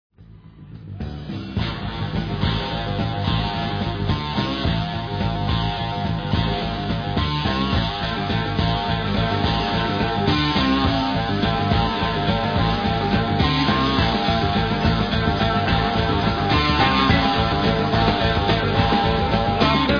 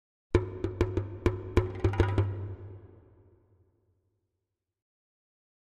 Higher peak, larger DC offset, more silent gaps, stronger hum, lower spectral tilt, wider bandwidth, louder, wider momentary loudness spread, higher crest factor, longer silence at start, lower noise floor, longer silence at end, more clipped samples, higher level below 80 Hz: first, -4 dBFS vs -10 dBFS; neither; neither; neither; second, -7 dB/octave vs -8.5 dB/octave; second, 5.4 kHz vs 8.4 kHz; first, -21 LUFS vs -31 LUFS; second, 7 LU vs 15 LU; second, 16 dB vs 24 dB; about the same, 0.2 s vs 0.3 s; second, -44 dBFS vs -86 dBFS; second, 0 s vs 2.85 s; neither; first, -32 dBFS vs -42 dBFS